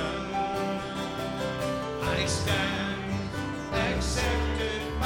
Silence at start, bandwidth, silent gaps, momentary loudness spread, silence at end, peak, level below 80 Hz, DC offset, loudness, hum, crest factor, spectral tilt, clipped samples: 0 s; 17.5 kHz; none; 5 LU; 0 s; -14 dBFS; -40 dBFS; under 0.1%; -29 LUFS; none; 16 dB; -4.5 dB/octave; under 0.1%